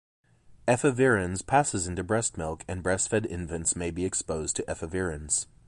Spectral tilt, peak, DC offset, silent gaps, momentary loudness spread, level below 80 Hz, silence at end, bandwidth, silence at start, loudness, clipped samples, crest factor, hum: -4 dB/octave; -8 dBFS; under 0.1%; none; 9 LU; -46 dBFS; 0.25 s; 11.5 kHz; 0.5 s; -28 LUFS; under 0.1%; 20 dB; none